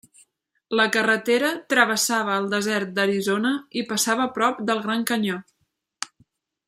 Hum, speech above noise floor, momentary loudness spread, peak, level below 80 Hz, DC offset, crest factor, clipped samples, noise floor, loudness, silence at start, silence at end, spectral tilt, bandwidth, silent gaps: none; 51 dB; 9 LU; -2 dBFS; -72 dBFS; under 0.1%; 20 dB; under 0.1%; -74 dBFS; -22 LUFS; 0.7 s; 0.6 s; -3 dB/octave; 16 kHz; none